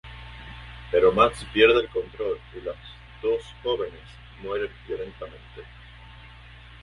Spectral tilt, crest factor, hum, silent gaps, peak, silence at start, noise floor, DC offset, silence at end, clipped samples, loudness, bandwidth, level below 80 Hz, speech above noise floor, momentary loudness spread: -5.5 dB/octave; 24 dB; 60 Hz at -45 dBFS; none; -4 dBFS; 0.05 s; -46 dBFS; under 0.1%; 0.55 s; under 0.1%; -24 LUFS; 11.5 kHz; -46 dBFS; 21 dB; 27 LU